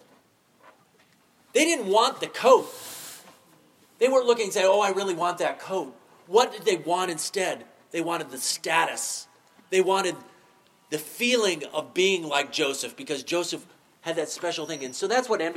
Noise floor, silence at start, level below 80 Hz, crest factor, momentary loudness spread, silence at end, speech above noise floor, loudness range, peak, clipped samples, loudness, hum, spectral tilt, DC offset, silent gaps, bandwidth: -61 dBFS; 0.65 s; -86 dBFS; 22 dB; 13 LU; 0 s; 36 dB; 4 LU; -6 dBFS; under 0.1%; -25 LUFS; none; -2.5 dB/octave; under 0.1%; none; 16.5 kHz